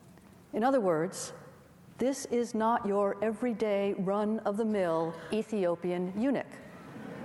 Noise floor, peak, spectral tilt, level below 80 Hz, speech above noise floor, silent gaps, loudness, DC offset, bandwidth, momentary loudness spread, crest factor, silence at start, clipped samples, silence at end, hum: -55 dBFS; -16 dBFS; -6 dB/octave; -70 dBFS; 25 dB; none; -31 LUFS; under 0.1%; 12.5 kHz; 13 LU; 16 dB; 0.05 s; under 0.1%; 0 s; none